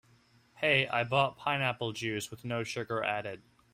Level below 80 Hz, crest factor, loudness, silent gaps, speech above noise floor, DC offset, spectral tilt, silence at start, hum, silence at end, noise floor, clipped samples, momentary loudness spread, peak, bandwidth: -68 dBFS; 22 dB; -31 LUFS; none; 33 dB; under 0.1%; -4.5 dB/octave; 0.55 s; none; 0.35 s; -65 dBFS; under 0.1%; 10 LU; -12 dBFS; 16 kHz